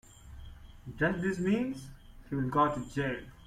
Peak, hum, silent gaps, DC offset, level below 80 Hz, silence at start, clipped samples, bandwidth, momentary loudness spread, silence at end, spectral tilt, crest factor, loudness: -14 dBFS; none; none; under 0.1%; -52 dBFS; 0.1 s; under 0.1%; 14.5 kHz; 23 LU; 0 s; -7 dB/octave; 18 dB; -32 LUFS